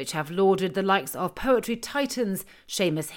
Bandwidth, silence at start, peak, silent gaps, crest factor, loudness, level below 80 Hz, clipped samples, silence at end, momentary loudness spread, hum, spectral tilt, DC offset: 17 kHz; 0 s; -8 dBFS; none; 18 dB; -26 LUFS; -52 dBFS; under 0.1%; 0 s; 8 LU; none; -4.5 dB/octave; under 0.1%